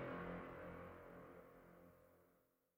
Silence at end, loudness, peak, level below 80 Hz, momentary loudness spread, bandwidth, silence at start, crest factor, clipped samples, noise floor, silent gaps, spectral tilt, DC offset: 0.35 s; -55 LUFS; -38 dBFS; -72 dBFS; 16 LU; 16 kHz; 0 s; 18 dB; under 0.1%; -80 dBFS; none; -7.5 dB/octave; under 0.1%